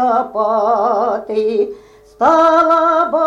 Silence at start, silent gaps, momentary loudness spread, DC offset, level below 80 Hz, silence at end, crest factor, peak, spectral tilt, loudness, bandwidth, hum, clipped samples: 0 s; none; 7 LU; under 0.1%; -54 dBFS; 0 s; 12 dB; -2 dBFS; -5 dB/octave; -14 LUFS; 7.8 kHz; none; under 0.1%